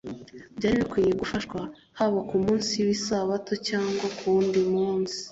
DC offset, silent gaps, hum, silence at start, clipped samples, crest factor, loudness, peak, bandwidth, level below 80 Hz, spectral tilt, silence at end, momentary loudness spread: under 0.1%; none; none; 0.05 s; under 0.1%; 14 dB; -26 LUFS; -12 dBFS; 8 kHz; -54 dBFS; -5 dB/octave; 0 s; 11 LU